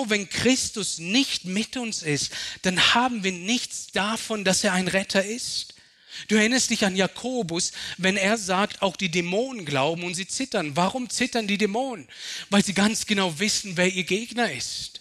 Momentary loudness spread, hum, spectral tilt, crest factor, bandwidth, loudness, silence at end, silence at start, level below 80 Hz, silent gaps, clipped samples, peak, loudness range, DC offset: 8 LU; none; -3 dB/octave; 18 dB; 13.5 kHz; -24 LUFS; 0 s; 0 s; -60 dBFS; none; under 0.1%; -8 dBFS; 2 LU; under 0.1%